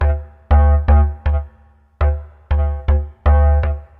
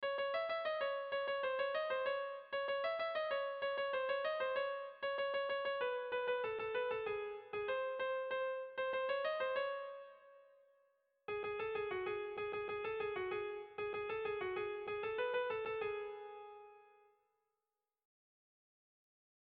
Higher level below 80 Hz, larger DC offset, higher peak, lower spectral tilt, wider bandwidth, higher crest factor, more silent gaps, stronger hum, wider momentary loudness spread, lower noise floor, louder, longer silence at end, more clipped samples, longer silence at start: first, -18 dBFS vs -78 dBFS; neither; first, -2 dBFS vs -28 dBFS; first, -10.5 dB/octave vs -0.5 dB/octave; second, 3.4 kHz vs 5 kHz; about the same, 12 dB vs 14 dB; neither; neither; first, 10 LU vs 6 LU; second, -49 dBFS vs under -90 dBFS; first, -17 LUFS vs -40 LUFS; second, 0.15 s vs 2.55 s; neither; about the same, 0 s vs 0 s